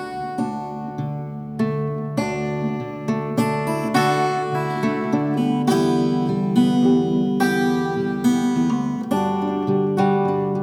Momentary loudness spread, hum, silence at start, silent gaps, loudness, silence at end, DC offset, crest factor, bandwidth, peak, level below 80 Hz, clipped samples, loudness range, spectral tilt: 8 LU; none; 0 s; none; -21 LUFS; 0 s; under 0.1%; 16 dB; 15.5 kHz; -6 dBFS; -56 dBFS; under 0.1%; 5 LU; -6.5 dB/octave